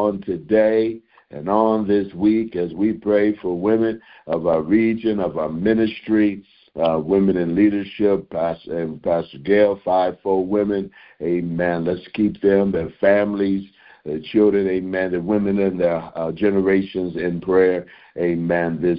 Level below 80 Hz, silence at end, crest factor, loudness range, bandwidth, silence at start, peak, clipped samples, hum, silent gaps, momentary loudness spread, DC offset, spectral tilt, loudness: -50 dBFS; 0 s; 16 dB; 1 LU; 5.2 kHz; 0 s; -2 dBFS; under 0.1%; none; none; 9 LU; under 0.1%; -12 dB/octave; -20 LUFS